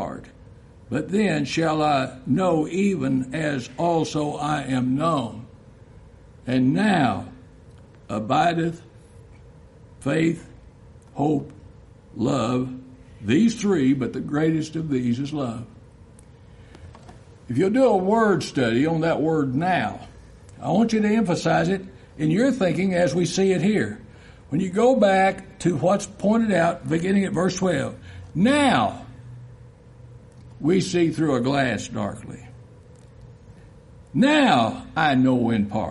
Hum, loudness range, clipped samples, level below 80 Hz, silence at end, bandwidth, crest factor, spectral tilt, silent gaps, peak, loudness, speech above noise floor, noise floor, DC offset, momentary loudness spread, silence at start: none; 5 LU; under 0.1%; -52 dBFS; 0 s; 11.5 kHz; 18 dB; -6 dB/octave; none; -4 dBFS; -22 LUFS; 26 dB; -47 dBFS; under 0.1%; 14 LU; 0 s